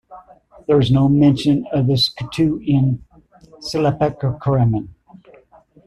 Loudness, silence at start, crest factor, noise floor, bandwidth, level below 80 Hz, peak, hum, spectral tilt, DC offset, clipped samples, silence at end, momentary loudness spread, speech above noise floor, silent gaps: -17 LUFS; 0.1 s; 16 dB; -50 dBFS; 12 kHz; -44 dBFS; -4 dBFS; none; -7.5 dB/octave; under 0.1%; under 0.1%; 0.95 s; 11 LU; 33 dB; none